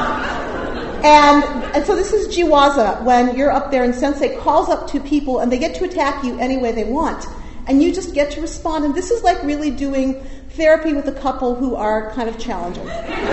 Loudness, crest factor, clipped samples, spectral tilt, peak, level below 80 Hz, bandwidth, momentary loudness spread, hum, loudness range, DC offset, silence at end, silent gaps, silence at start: -17 LUFS; 16 dB; under 0.1%; -4.5 dB/octave; 0 dBFS; -32 dBFS; 8.4 kHz; 12 LU; none; 5 LU; under 0.1%; 0 s; none; 0 s